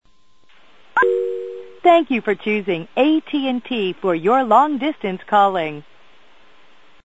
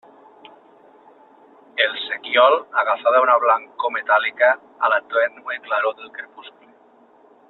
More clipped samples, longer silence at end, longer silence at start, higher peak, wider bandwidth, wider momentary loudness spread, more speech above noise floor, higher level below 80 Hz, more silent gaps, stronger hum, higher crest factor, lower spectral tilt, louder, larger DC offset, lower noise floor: neither; first, 1.25 s vs 1 s; second, 0.95 s vs 1.75 s; about the same, -2 dBFS vs -2 dBFS; first, 8 kHz vs 4.3 kHz; second, 11 LU vs 15 LU; first, 39 dB vs 33 dB; first, -64 dBFS vs -76 dBFS; neither; neither; about the same, 18 dB vs 18 dB; first, -6.5 dB/octave vs -4 dB/octave; about the same, -18 LUFS vs -19 LUFS; first, 0.6% vs under 0.1%; first, -57 dBFS vs -53 dBFS